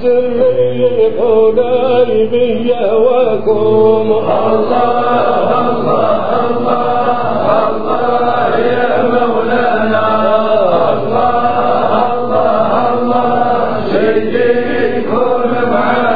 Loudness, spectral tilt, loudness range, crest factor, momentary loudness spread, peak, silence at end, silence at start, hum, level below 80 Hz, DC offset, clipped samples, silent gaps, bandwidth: -12 LUFS; -9 dB/octave; 2 LU; 12 dB; 3 LU; 0 dBFS; 0 s; 0 s; none; -48 dBFS; 9%; under 0.1%; none; 5 kHz